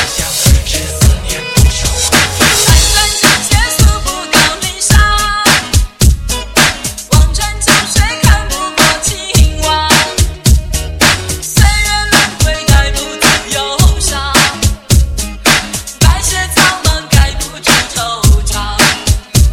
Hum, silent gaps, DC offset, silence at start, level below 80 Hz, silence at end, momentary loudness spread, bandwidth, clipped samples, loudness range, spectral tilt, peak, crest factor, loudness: none; none; 0.3%; 0 s; -14 dBFS; 0 s; 6 LU; 17 kHz; 0.3%; 2 LU; -3 dB/octave; 0 dBFS; 10 dB; -10 LUFS